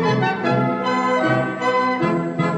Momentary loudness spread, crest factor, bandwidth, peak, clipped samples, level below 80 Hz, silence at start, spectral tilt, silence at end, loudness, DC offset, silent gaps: 2 LU; 12 dB; 9.2 kHz; -6 dBFS; under 0.1%; -58 dBFS; 0 s; -7 dB/octave; 0 s; -19 LUFS; under 0.1%; none